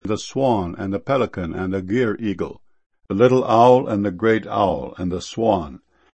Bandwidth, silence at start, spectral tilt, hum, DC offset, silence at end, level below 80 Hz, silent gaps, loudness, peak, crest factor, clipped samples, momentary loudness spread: 8.6 kHz; 0.05 s; -6.5 dB/octave; none; under 0.1%; 0.4 s; -48 dBFS; 2.86-2.90 s; -20 LUFS; 0 dBFS; 20 dB; under 0.1%; 12 LU